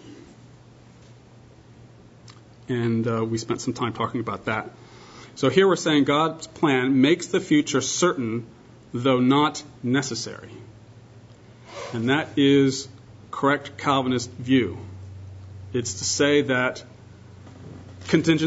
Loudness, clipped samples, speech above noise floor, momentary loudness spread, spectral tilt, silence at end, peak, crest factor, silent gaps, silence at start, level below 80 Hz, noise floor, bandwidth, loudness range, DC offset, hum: -23 LUFS; under 0.1%; 27 dB; 22 LU; -4.5 dB/octave; 0 s; -4 dBFS; 20 dB; none; 0.05 s; -60 dBFS; -49 dBFS; 8 kHz; 7 LU; under 0.1%; none